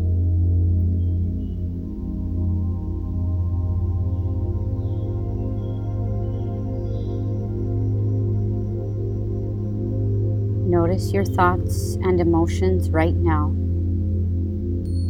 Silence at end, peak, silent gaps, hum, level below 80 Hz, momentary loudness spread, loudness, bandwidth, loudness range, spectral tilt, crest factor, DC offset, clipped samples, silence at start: 0 s; -2 dBFS; none; none; -30 dBFS; 7 LU; -23 LUFS; 10.5 kHz; 5 LU; -8.5 dB/octave; 18 dB; under 0.1%; under 0.1%; 0 s